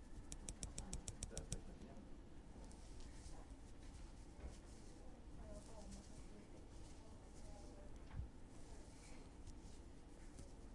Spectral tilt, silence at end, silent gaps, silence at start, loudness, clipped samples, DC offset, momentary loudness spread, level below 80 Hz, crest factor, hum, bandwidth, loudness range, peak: -4.5 dB/octave; 0 s; none; 0 s; -57 LUFS; under 0.1%; under 0.1%; 10 LU; -58 dBFS; 28 dB; none; 11.5 kHz; 5 LU; -28 dBFS